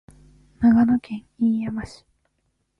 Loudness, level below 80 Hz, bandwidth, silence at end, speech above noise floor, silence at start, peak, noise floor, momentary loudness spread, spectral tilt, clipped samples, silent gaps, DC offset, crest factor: -21 LUFS; -50 dBFS; 5.8 kHz; 0.9 s; 51 dB; 0.6 s; -8 dBFS; -72 dBFS; 17 LU; -8 dB/octave; under 0.1%; none; under 0.1%; 16 dB